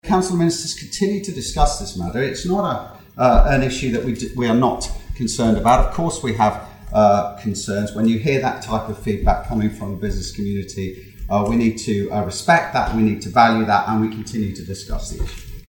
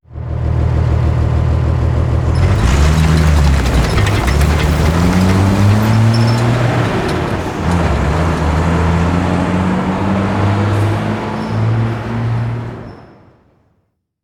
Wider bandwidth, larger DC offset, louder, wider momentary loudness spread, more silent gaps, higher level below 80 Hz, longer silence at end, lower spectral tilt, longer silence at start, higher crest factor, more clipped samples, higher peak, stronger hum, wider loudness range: about the same, 17 kHz vs 15.5 kHz; neither; second, -20 LUFS vs -14 LUFS; first, 13 LU vs 7 LU; neither; second, -28 dBFS vs -20 dBFS; second, 0.1 s vs 1.2 s; second, -5.5 dB/octave vs -7 dB/octave; about the same, 0.05 s vs 0.1 s; first, 18 dB vs 12 dB; neither; about the same, 0 dBFS vs 0 dBFS; neither; about the same, 4 LU vs 5 LU